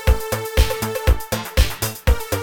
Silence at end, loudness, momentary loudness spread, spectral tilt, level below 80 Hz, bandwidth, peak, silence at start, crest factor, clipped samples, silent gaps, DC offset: 0 s; -21 LUFS; 2 LU; -4.5 dB/octave; -22 dBFS; over 20 kHz; -2 dBFS; 0 s; 16 dB; under 0.1%; none; 0.2%